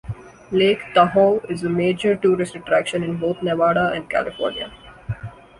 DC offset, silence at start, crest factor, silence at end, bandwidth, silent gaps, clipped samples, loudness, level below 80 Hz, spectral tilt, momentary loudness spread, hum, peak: under 0.1%; 0.05 s; 18 dB; 0.25 s; 11.5 kHz; none; under 0.1%; -20 LUFS; -50 dBFS; -6 dB/octave; 15 LU; none; -2 dBFS